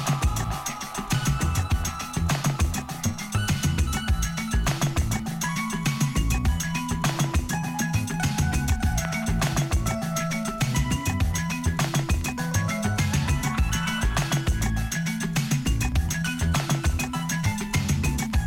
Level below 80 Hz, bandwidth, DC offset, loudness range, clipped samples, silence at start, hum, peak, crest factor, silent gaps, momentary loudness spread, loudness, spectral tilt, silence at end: -30 dBFS; 17 kHz; under 0.1%; 1 LU; under 0.1%; 0 s; none; -10 dBFS; 14 dB; none; 3 LU; -26 LUFS; -4.5 dB/octave; 0 s